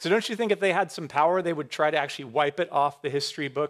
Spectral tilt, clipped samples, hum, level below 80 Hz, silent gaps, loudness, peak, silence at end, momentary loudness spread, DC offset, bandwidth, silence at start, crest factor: -4.5 dB/octave; under 0.1%; none; -78 dBFS; none; -26 LUFS; -8 dBFS; 0 s; 5 LU; under 0.1%; 14 kHz; 0 s; 18 dB